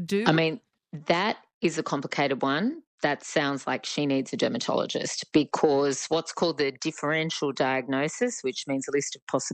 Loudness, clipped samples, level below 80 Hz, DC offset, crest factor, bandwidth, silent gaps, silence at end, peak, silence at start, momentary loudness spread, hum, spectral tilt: -27 LUFS; under 0.1%; -70 dBFS; under 0.1%; 20 dB; 9.4 kHz; 1.54-1.61 s, 2.87-2.98 s, 9.22-9.27 s; 0 s; -8 dBFS; 0 s; 7 LU; none; -4 dB/octave